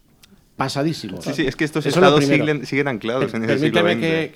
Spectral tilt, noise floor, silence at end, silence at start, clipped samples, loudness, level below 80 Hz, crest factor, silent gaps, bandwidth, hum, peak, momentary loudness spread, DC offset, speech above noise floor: -5.5 dB/octave; -52 dBFS; 0.05 s; 0.6 s; under 0.1%; -19 LUFS; -50 dBFS; 18 dB; none; 16 kHz; none; -2 dBFS; 10 LU; under 0.1%; 33 dB